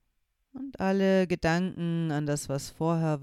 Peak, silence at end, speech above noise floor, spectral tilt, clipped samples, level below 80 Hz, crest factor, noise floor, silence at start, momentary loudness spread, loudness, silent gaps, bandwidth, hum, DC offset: -12 dBFS; 0 s; 48 dB; -6.5 dB/octave; under 0.1%; -54 dBFS; 18 dB; -75 dBFS; 0.55 s; 9 LU; -28 LUFS; none; 14 kHz; none; under 0.1%